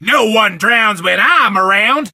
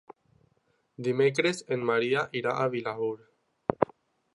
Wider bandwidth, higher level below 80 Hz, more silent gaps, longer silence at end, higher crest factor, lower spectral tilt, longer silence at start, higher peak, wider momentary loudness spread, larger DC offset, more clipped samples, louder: first, 16 kHz vs 11.5 kHz; about the same, -66 dBFS vs -66 dBFS; neither; second, 0.05 s vs 0.5 s; second, 12 dB vs 26 dB; second, -3 dB/octave vs -5.5 dB/octave; second, 0 s vs 1 s; first, 0 dBFS vs -4 dBFS; second, 2 LU vs 9 LU; neither; neither; first, -10 LUFS vs -29 LUFS